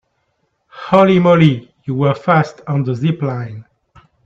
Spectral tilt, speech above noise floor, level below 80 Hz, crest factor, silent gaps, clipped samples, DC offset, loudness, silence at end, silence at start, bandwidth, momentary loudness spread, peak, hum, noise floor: -8.5 dB/octave; 53 dB; -54 dBFS; 16 dB; none; under 0.1%; under 0.1%; -15 LUFS; 0.65 s; 0.75 s; 7.4 kHz; 16 LU; 0 dBFS; none; -66 dBFS